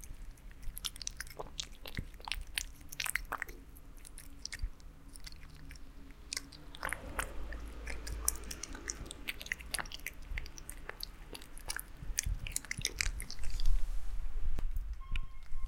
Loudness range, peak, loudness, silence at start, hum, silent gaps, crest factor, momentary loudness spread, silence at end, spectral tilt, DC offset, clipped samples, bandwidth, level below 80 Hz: 5 LU; -6 dBFS; -41 LUFS; 0 s; none; none; 30 dB; 16 LU; 0 s; -1.5 dB/octave; under 0.1%; under 0.1%; 17 kHz; -40 dBFS